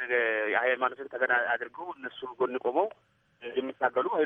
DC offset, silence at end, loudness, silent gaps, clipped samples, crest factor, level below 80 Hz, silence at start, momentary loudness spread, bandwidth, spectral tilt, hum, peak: under 0.1%; 0 s; -30 LUFS; none; under 0.1%; 20 dB; -80 dBFS; 0 s; 13 LU; 3.9 kHz; -6.5 dB/octave; none; -10 dBFS